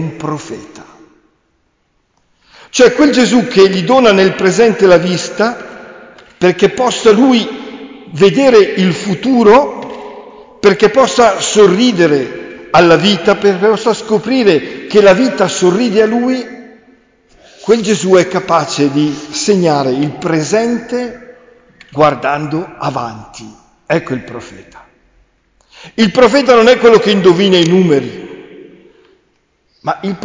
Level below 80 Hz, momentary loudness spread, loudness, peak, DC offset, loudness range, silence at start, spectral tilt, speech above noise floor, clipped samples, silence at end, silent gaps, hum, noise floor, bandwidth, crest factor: -48 dBFS; 18 LU; -10 LUFS; 0 dBFS; under 0.1%; 8 LU; 0 s; -5 dB/octave; 50 dB; under 0.1%; 0 s; none; none; -60 dBFS; 7.6 kHz; 12 dB